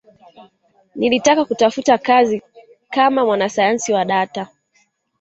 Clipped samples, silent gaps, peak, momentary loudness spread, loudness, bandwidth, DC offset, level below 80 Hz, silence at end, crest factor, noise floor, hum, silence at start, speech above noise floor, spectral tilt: under 0.1%; none; 0 dBFS; 11 LU; -16 LUFS; 8.2 kHz; under 0.1%; -60 dBFS; 0.75 s; 16 dB; -62 dBFS; none; 0.4 s; 46 dB; -3.5 dB/octave